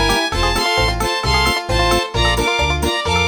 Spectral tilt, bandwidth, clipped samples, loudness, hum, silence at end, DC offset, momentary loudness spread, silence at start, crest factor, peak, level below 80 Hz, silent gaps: -3.5 dB/octave; 19.5 kHz; under 0.1%; -16 LUFS; none; 0 s; under 0.1%; 2 LU; 0 s; 14 dB; -4 dBFS; -24 dBFS; none